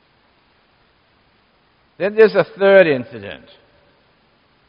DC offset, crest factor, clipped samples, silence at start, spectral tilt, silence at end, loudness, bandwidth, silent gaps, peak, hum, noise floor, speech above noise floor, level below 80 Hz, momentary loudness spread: under 0.1%; 20 dB; under 0.1%; 2 s; -4 dB/octave; 1.35 s; -14 LUFS; 5.4 kHz; none; 0 dBFS; none; -58 dBFS; 43 dB; -64 dBFS; 22 LU